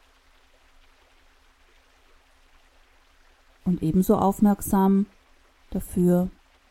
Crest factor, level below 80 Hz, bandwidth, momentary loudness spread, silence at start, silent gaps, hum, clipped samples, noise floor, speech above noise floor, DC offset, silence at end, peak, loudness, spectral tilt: 18 dB; -46 dBFS; 16.5 kHz; 12 LU; 3.65 s; none; none; under 0.1%; -58 dBFS; 37 dB; under 0.1%; 0.4 s; -8 dBFS; -23 LUFS; -8 dB/octave